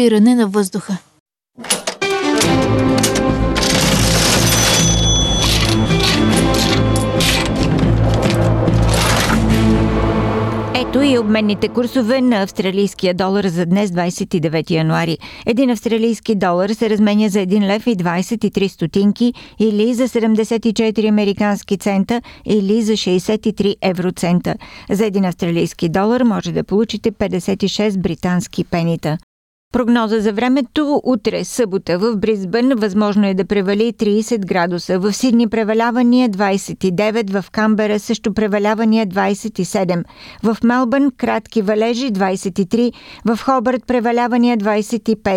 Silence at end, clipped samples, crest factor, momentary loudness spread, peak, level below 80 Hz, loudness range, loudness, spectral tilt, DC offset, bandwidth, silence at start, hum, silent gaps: 0 s; under 0.1%; 14 dB; 6 LU; -2 dBFS; -30 dBFS; 4 LU; -16 LUFS; -5 dB/octave; under 0.1%; 15.5 kHz; 0 s; none; 1.20-1.26 s, 29.23-29.71 s